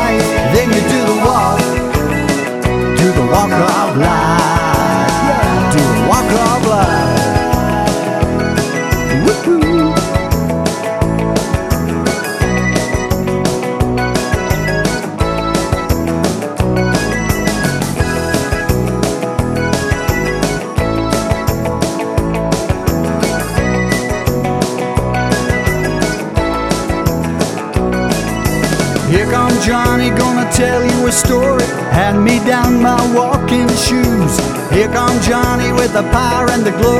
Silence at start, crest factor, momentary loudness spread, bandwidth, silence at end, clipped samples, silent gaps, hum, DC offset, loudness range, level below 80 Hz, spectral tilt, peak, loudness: 0 s; 12 dB; 5 LU; 16.5 kHz; 0 s; under 0.1%; none; none; under 0.1%; 4 LU; -26 dBFS; -5 dB/octave; 0 dBFS; -13 LUFS